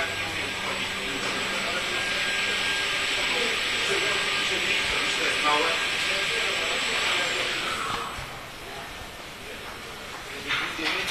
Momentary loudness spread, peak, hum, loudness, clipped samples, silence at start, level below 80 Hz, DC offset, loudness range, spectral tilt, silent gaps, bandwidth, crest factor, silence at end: 14 LU; -10 dBFS; none; -24 LUFS; under 0.1%; 0 s; -52 dBFS; under 0.1%; 8 LU; -1 dB/octave; none; 14 kHz; 18 dB; 0 s